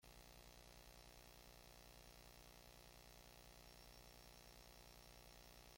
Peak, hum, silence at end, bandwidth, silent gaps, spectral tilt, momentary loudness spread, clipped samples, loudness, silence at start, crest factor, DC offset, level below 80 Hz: -46 dBFS; 60 Hz at -75 dBFS; 0 s; 16.5 kHz; none; -3 dB/octave; 1 LU; under 0.1%; -63 LUFS; 0 s; 18 dB; under 0.1%; -70 dBFS